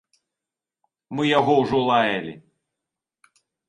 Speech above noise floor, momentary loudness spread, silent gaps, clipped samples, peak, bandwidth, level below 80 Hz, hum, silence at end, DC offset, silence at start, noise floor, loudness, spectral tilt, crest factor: 68 dB; 13 LU; none; under 0.1%; -4 dBFS; 10.5 kHz; -60 dBFS; none; 1.3 s; under 0.1%; 1.1 s; -88 dBFS; -20 LUFS; -6 dB/octave; 20 dB